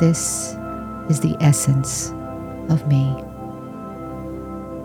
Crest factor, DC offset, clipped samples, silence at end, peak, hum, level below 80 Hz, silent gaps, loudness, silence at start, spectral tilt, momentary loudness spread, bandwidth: 16 dB; under 0.1%; under 0.1%; 0 s; -4 dBFS; none; -44 dBFS; none; -21 LUFS; 0 s; -5.5 dB/octave; 16 LU; 16.5 kHz